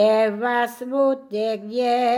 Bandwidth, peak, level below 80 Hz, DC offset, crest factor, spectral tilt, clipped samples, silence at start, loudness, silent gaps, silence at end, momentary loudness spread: 18 kHz; -8 dBFS; -74 dBFS; under 0.1%; 12 dB; -5 dB/octave; under 0.1%; 0 s; -22 LUFS; none; 0 s; 5 LU